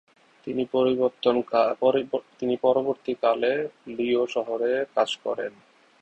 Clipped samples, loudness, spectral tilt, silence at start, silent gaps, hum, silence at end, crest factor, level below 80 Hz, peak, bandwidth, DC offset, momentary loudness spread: under 0.1%; -25 LUFS; -5.5 dB/octave; 0.45 s; none; none; 0.5 s; 18 dB; -68 dBFS; -6 dBFS; 8.4 kHz; under 0.1%; 9 LU